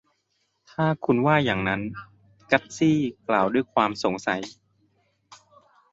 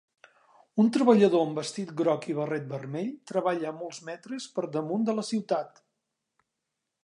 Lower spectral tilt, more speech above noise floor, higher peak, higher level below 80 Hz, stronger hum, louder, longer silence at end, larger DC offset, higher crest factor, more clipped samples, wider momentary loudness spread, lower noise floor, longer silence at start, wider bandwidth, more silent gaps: about the same, -6 dB/octave vs -6 dB/octave; second, 49 dB vs 57 dB; first, -2 dBFS vs -6 dBFS; first, -58 dBFS vs -80 dBFS; neither; first, -24 LUFS vs -28 LUFS; second, 0.6 s vs 1.35 s; neither; about the same, 22 dB vs 22 dB; neither; second, 11 LU vs 16 LU; second, -73 dBFS vs -84 dBFS; about the same, 0.8 s vs 0.75 s; second, 8 kHz vs 11 kHz; neither